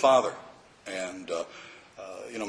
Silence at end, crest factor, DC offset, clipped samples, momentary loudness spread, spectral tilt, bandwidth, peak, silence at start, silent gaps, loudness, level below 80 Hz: 0 s; 20 dB; under 0.1%; under 0.1%; 21 LU; -3 dB/octave; 10.5 kHz; -8 dBFS; 0 s; none; -31 LUFS; -70 dBFS